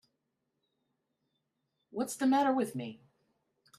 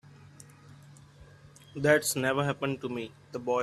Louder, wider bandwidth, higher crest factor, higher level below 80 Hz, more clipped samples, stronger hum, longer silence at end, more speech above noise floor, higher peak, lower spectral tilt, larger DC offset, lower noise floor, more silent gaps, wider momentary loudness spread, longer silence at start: about the same, -31 LUFS vs -29 LUFS; second, 13.5 kHz vs 15 kHz; second, 18 dB vs 24 dB; second, -84 dBFS vs -66 dBFS; neither; neither; first, 0.85 s vs 0 s; first, 53 dB vs 25 dB; second, -18 dBFS vs -8 dBFS; about the same, -5 dB/octave vs -4.5 dB/octave; neither; first, -83 dBFS vs -54 dBFS; neither; about the same, 16 LU vs 14 LU; first, 1.95 s vs 0.2 s